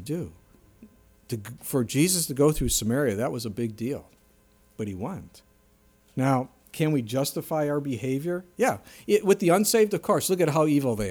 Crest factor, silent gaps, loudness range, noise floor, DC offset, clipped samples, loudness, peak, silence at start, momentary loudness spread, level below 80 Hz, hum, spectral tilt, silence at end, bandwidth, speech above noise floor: 18 dB; none; 8 LU; -61 dBFS; under 0.1%; under 0.1%; -25 LUFS; -8 dBFS; 0 s; 14 LU; -48 dBFS; none; -5 dB/octave; 0 s; over 20 kHz; 36 dB